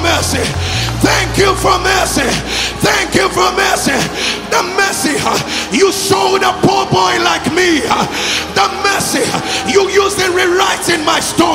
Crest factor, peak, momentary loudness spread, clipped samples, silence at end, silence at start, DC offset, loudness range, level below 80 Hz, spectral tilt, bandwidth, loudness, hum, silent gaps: 12 dB; 0 dBFS; 4 LU; under 0.1%; 0 s; 0 s; under 0.1%; 1 LU; -32 dBFS; -3 dB/octave; 16.5 kHz; -12 LUFS; none; none